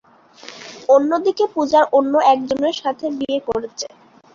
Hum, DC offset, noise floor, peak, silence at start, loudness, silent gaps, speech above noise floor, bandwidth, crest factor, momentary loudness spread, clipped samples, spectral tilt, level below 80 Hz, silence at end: none; under 0.1%; -42 dBFS; -2 dBFS; 0.45 s; -17 LUFS; none; 25 dB; 7.4 kHz; 16 dB; 16 LU; under 0.1%; -4 dB/octave; -58 dBFS; 0.45 s